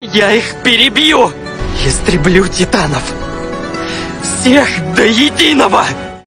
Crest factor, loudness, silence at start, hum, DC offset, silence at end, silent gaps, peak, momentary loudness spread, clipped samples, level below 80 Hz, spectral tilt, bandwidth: 12 dB; -10 LUFS; 0 s; none; under 0.1%; 0.05 s; none; 0 dBFS; 12 LU; 0.3%; -26 dBFS; -3.5 dB/octave; 16 kHz